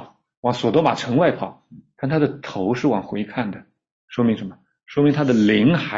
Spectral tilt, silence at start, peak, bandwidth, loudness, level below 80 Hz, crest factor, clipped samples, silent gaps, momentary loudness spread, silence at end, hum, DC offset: -7 dB/octave; 0 s; -4 dBFS; 7.8 kHz; -20 LUFS; -56 dBFS; 16 dB; under 0.1%; 0.37-0.43 s, 3.92-4.08 s; 13 LU; 0 s; none; under 0.1%